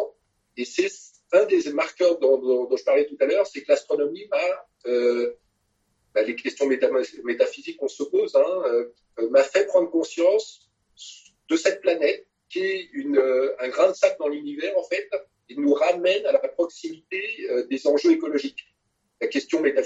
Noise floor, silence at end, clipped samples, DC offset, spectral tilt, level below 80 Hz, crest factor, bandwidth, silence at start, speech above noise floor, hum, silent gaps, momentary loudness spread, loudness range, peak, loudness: -73 dBFS; 0 s; under 0.1%; under 0.1%; -3 dB/octave; -76 dBFS; 18 dB; 8 kHz; 0 s; 50 dB; none; none; 12 LU; 3 LU; -6 dBFS; -23 LUFS